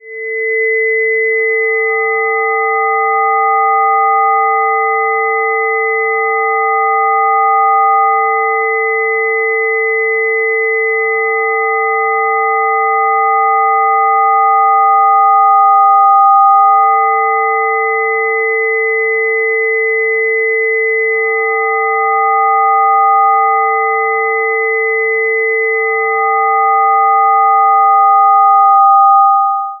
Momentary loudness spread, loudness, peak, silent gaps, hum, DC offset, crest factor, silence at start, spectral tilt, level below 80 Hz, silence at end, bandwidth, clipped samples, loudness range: 5 LU; -11 LUFS; 0 dBFS; none; none; under 0.1%; 10 dB; 0.05 s; -5.5 dB/octave; -84 dBFS; 0 s; 2.2 kHz; under 0.1%; 4 LU